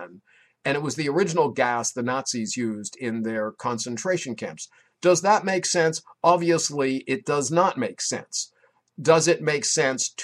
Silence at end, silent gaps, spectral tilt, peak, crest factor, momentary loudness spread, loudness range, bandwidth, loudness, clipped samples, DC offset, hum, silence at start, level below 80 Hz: 0 s; none; -3.5 dB/octave; -4 dBFS; 20 dB; 11 LU; 4 LU; 13 kHz; -24 LUFS; under 0.1%; under 0.1%; none; 0 s; -70 dBFS